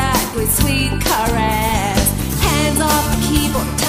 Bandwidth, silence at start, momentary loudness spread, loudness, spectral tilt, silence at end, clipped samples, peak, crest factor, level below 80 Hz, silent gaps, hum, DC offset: 15.5 kHz; 0 s; 2 LU; -16 LUFS; -4 dB/octave; 0 s; under 0.1%; -2 dBFS; 14 dB; -24 dBFS; none; none; under 0.1%